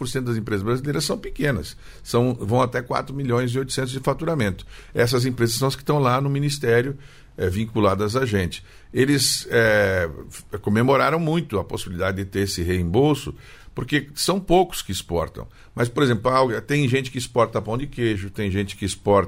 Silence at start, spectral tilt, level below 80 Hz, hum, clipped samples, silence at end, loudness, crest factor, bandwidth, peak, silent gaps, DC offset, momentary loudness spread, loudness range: 0 s; -5 dB/octave; -42 dBFS; none; under 0.1%; 0 s; -22 LUFS; 16 dB; 16 kHz; -6 dBFS; none; under 0.1%; 10 LU; 3 LU